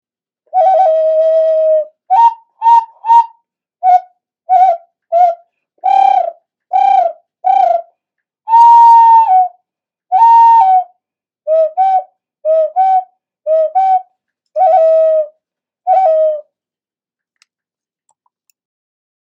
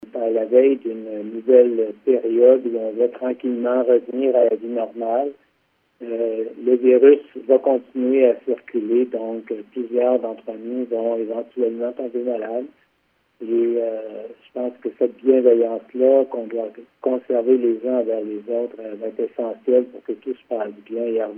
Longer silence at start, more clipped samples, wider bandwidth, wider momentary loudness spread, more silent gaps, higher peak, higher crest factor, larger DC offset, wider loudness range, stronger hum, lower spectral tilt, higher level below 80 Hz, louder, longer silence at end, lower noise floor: first, 0.55 s vs 0 s; neither; first, 7 kHz vs 3.4 kHz; about the same, 13 LU vs 15 LU; neither; about the same, 0 dBFS vs 0 dBFS; second, 12 dB vs 20 dB; neither; about the same, 6 LU vs 7 LU; neither; second, -1.5 dB/octave vs -9.5 dB/octave; first, -74 dBFS vs -80 dBFS; first, -10 LUFS vs -20 LUFS; first, 3 s vs 0 s; first, under -90 dBFS vs -66 dBFS